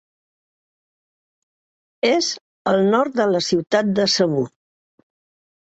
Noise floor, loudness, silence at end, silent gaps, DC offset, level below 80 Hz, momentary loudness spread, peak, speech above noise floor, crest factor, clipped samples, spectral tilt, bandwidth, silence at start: under -90 dBFS; -19 LUFS; 1.2 s; 2.41-2.65 s; under 0.1%; -62 dBFS; 7 LU; -4 dBFS; over 72 dB; 18 dB; under 0.1%; -4.5 dB/octave; 8.2 kHz; 2.05 s